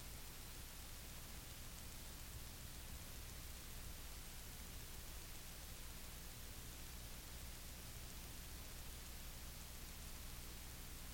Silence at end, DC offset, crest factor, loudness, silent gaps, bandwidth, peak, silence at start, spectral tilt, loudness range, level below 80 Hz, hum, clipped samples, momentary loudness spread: 0 s; under 0.1%; 14 dB; -53 LUFS; none; 17 kHz; -38 dBFS; 0 s; -3 dB/octave; 0 LU; -56 dBFS; 60 Hz at -60 dBFS; under 0.1%; 0 LU